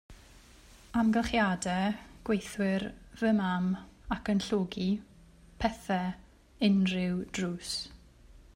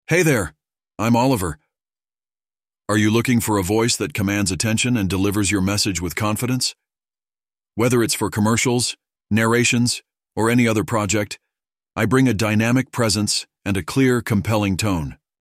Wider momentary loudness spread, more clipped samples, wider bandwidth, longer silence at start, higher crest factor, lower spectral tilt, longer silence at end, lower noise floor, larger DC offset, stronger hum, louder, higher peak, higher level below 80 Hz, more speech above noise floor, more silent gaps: about the same, 10 LU vs 8 LU; neither; second, 13.5 kHz vs 15.5 kHz; about the same, 0.1 s vs 0.1 s; about the same, 18 dB vs 16 dB; about the same, -5.5 dB/octave vs -4.5 dB/octave; about the same, 0.15 s vs 0.25 s; second, -56 dBFS vs under -90 dBFS; neither; neither; second, -31 LUFS vs -19 LUFS; second, -14 dBFS vs -4 dBFS; second, -52 dBFS vs -46 dBFS; second, 26 dB vs over 71 dB; neither